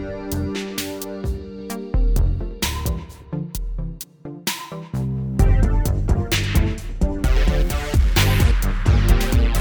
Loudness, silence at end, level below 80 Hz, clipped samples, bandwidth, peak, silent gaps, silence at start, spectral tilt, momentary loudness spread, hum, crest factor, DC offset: -22 LUFS; 0 s; -22 dBFS; under 0.1%; over 20 kHz; -2 dBFS; none; 0 s; -5 dB/octave; 13 LU; none; 16 dB; under 0.1%